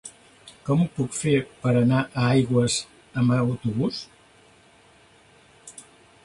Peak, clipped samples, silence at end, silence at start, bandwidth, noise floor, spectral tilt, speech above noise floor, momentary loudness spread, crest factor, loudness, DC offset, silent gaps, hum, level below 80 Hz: -8 dBFS; under 0.1%; 0.45 s; 0.05 s; 11.5 kHz; -55 dBFS; -6 dB/octave; 33 dB; 23 LU; 16 dB; -23 LUFS; under 0.1%; none; none; -56 dBFS